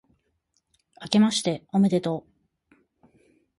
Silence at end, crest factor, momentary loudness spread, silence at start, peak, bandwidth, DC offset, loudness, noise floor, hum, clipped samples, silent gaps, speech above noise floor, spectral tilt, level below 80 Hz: 1.4 s; 22 dB; 12 LU; 1 s; -6 dBFS; 11.5 kHz; under 0.1%; -24 LUFS; -73 dBFS; none; under 0.1%; none; 50 dB; -5.5 dB/octave; -68 dBFS